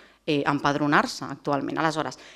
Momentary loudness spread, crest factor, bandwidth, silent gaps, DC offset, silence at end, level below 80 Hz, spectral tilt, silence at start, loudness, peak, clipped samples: 8 LU; 22 dB; 13 kHz; none; under 0.1%; 0 s; -62 dBFS; -5 dB/octave; 0.25 s; -25 LUFS; -4 dBFS; under 0.1%